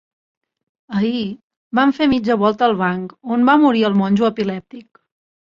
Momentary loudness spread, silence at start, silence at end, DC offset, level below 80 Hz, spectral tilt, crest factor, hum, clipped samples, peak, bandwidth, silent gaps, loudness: 13 LU; 0.9 s; 0.7 s; under 0.1%; -56 dBFS; -7.5 dB/octave; 16 dB; none; under 0.1%; -2 dBFS; 7.2 kHz; 1.43-1.50 s, 1.57-1.71 s; -17 LUFS